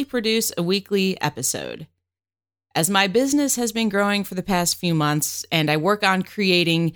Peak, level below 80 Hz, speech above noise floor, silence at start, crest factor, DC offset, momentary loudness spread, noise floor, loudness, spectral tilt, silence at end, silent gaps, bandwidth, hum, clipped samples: -4 dBFS; -54 dBFS; over 69 dB; 0 s; 18 dB; under 0.1%; 6 LU; under -90 dBFS; -21 LUFS; -3.5 dB/octave; 0 s; none; over 20 kHz; none; under 0.1%